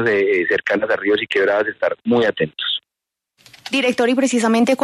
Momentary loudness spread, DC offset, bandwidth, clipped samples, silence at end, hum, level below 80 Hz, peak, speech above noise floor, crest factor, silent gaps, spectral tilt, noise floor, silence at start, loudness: 6 LU; under 0.1%; 13 kHz; under 0.1%; 0 s; none; -62 dBFS; -6 dBFS; 67 dB; 12 dB; none; -4 dB/octave; -84 dBFS; 0 s; -18 LUFS